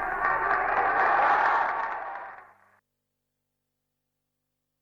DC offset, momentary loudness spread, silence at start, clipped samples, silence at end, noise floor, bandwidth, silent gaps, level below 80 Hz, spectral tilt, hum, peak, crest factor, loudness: under 0.1%; 15 LU; 0 s; under 0.1%; 2.4 s; -82 dBFS; 7.2 kHz; none; -58 dBFS; -4.5 dB/octave; 50 Hz at -75 dBFS; -12 dBFS; 16 dB; -24 LUFS